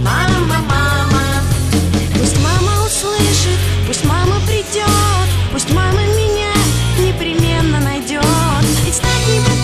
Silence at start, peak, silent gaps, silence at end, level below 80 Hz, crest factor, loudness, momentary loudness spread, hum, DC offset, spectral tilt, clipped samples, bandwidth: 0 s; 0 dBFS; none; 0 s; -24 dBFS; 14 dB; -14 LUFS; 3 LU; none; under 0.1%; -4.5 dB/octave; under 0.1%; 14 kHz